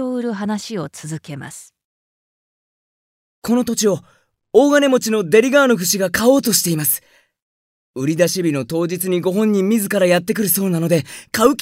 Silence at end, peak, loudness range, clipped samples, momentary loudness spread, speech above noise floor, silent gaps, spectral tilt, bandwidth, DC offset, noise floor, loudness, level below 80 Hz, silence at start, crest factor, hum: 0 s; 0 dBFS; 10 LU; under 0.1%; 15 LU; over 73 dB; 1.84-3.42 s, 7.42-7.94 s; -4.5 dB/octave; 16.5 kHz; under 0.1%; under -90 dBFS; -17 LUFS; -56 dBFS; 0 s; 18 dB; none